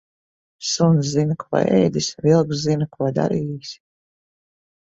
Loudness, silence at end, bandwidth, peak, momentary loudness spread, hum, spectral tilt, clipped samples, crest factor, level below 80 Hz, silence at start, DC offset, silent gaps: -20 LUFS; 1.15 s; 8 kHz; -4 dBFS; 11 LU; none; -6 dB/octave; under 0.1%; 18 dB; -56 dBFS; 0.6 s; under 0.1%; none